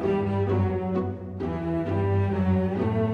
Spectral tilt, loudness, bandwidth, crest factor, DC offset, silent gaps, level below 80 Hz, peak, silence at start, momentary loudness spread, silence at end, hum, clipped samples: -10 dB/octave; -26 LUFS; 5 kHz; 12 dB; under 0.1%; none; -52 dBFS; -12 dBFS; 0 s; 6 LU; 0 s; none; under 0.1%